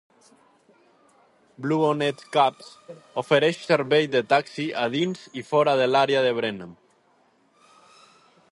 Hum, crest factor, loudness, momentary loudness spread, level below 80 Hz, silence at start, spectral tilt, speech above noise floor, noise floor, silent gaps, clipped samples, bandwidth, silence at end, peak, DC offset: none; 20 dB; -23 LUFS; 14 LU; -72 dBFS; 1.6 s; -5.5 dB/octave; 40 dB; -63 dBFS; none; under 0.1%; 11.5 kHz; 1.8 s; -6 dBFS; under 0.1%